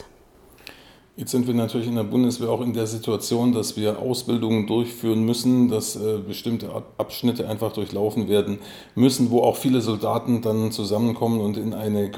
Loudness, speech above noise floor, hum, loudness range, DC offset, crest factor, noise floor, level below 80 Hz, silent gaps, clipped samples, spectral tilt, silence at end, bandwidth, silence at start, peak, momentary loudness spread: -23 LUFS; 29 dB; none; 3 LU; under 0.1%; 18 dB; -52 dBFS; -60 dBFS; none; under 0.1%; -6 dB/octave; 0 s; 18.5 kHz; 0 s; -4 dBFS; 8 LU